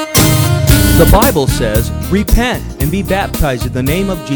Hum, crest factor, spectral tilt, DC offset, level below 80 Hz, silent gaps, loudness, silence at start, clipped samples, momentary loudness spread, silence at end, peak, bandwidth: none; 12 dB; -5 dB/octave; under 0.1%; -18 dBFS; none; -12 LUFS; 0 s; 0.5%; 8 LU; 0 s; 0 dBFS; over 20 kHz